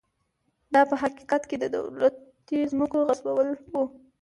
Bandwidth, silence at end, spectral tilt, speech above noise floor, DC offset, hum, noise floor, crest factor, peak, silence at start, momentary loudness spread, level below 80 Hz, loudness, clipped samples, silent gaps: 11.5 kHz; 0.3 s; -5.5 dB/octave; 49 dB; under 0.1%; none; -74 dBFS; 18 dB; -8 dBFS; 0.7 s; 8 LU; -66 dBFS; -26 LUFS; under 0.1%; none